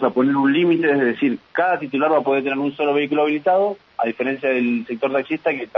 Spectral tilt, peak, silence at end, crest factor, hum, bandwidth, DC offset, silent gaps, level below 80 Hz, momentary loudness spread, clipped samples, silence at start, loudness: -8.5 dB/octave; -4 dBFS; 0 s; 16 dB; none; 5.6 kHz; under 0.1%; none; -70 dBFS; 6 LU; under 0.1%; 0 s; -19 LUFS